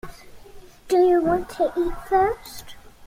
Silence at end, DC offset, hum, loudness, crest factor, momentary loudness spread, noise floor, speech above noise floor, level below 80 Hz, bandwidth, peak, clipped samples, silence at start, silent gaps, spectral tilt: 0.15 s; under 0.1%; none; -21 LUFS; 14 dB; 21 LU; -43 dBFS; 23 dB; -42 dBFS; 16 kHz; -8 dBFS; under 0.1%; 0.05 s; none; -5.5 dB/octave